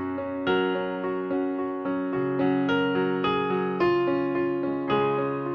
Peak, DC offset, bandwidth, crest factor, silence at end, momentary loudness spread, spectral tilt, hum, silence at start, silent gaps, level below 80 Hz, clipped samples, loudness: -12 dBFS; under 0.1%; 6.2 kHz; 14 dB; 0 s; 5 LU; -8.5 dB/octave; none; 0 s; none; -60 dBFS; under 0.1%; -26 LUFS